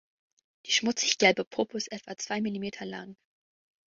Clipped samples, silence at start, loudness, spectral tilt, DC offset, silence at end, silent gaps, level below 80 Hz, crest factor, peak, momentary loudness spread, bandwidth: under 0.1%; 0.65 s; -28 LUFS; -2.5 dB/octave; under 0.1%; 0.75 s; 1.47-1.51 s; -72 dBFS; 26 dB; -6 dBFS; 17 LU; 7.8 kHz